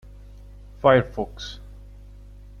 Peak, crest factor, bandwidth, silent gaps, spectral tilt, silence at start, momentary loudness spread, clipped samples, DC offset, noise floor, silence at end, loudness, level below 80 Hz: -2 dBFS; 24 dB; 7.2 kHz; none; -6.5 dB/octave; 0.85 s; 19 LU; under 0.1%; under 0.1%; -43 dBFS; 1.05 s; -21 LUFS; -42 dBFS